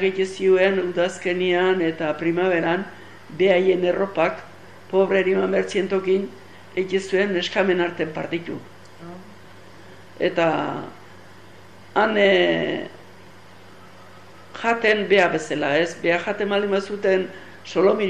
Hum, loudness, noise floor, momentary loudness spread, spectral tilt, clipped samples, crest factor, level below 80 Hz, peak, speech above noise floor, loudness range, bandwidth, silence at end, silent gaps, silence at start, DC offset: none; -21 LUFS; -46 dBFS; 16 LU; -5.5 dB/octave; under 0.1%; 16 dB; -64 dBFS; -6 dBFS; 26 dB; 5 LU; 9.8 kHz; 0 s; none; 0 s; 0.5%